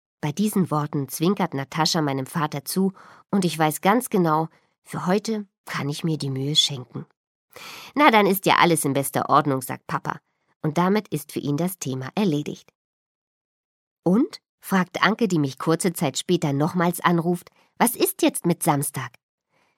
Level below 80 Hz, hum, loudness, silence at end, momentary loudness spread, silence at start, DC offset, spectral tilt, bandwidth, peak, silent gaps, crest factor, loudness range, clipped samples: -68 dBFS; none; -23 LUFS; 0.7 s; 12 LU; 0.25 s; under 0.1%; -4.5 dB/octave; 16.5 kHz; -2 dBFS; 4.78-4.82 s, 5.58-5.64 s, 7.17-7.48 s, 10.56-10.60 s, 12.75-13.96 s, 14.49-14.58 s; 22 dB; 6 LU; under 0.1%